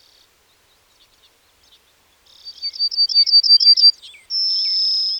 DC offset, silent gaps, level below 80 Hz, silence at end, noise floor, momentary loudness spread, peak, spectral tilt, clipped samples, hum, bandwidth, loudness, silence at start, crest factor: under 0.1%; none; -70 dBFS; 0 s; -57 dBFS; 14 LU; -4 dBFS; 3.5 dB/octave; under 0.1%; none; 17 kHz; -12 LUFS; 2.45 s; 16 dB